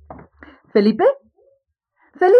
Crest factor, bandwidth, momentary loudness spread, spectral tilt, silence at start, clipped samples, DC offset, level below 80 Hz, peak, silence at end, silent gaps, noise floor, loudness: 16 dB; 5.8 kHz; 17 LU; -8 dB/octave; 0.1 s; under 0.1%; under 0.1%; -58 dBFS; -2 dBFS; 0 s; none; -65 dBFS; -17 LUFS